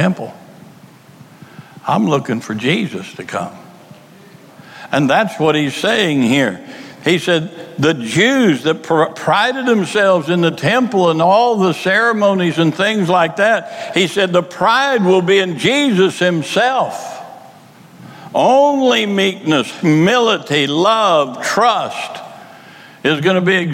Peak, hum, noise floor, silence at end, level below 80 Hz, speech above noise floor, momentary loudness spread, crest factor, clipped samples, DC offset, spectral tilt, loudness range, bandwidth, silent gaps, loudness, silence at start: -2 dBFS; none; -41 dBFS; 0 s; -62 dBFS; 27 dB; 12 LU; 14 dB; under 0.1%; under 0.1%; -5 dB/octave; 7 LU; 16.5 kHz; none; -14 LUFS; 0 s